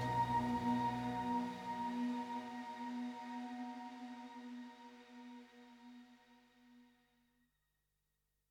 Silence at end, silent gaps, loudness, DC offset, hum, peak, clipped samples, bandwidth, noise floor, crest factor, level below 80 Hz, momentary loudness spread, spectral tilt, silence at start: 1.65 s; none; -42 LUFS; under 0.1%; 50 Hz at -85 dBFS; -26 dBFS; under 0.1%; 13.5 kHz; -85 dBFS; 18 dB; -70 dBFS; 21 LU; -6.5 dB/octave; 0 s